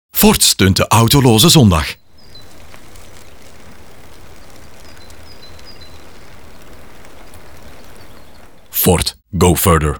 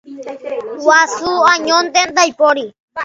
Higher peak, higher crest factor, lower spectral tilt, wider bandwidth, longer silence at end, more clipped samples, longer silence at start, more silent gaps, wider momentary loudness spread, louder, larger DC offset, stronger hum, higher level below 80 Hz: about the same, 0 dBFS vs 0 dBFS; about the same, 16 dB vs 14 dB; first, -4 dB/octave vs -0.5 dB/octave; first, over 20 kHz vs 7.8 kHz; about the same, 0 s vs 0 s; neither; about the same, 0.1 s vs 0.05 s; second, none vs 2.80-2.88 s; second, 12 LU vs 15 LU; about the same, -11 LUFS vs -12 LUFS; first, 2% vs under 0.1%; neither; first, -34 dBFS vs -58 dBFS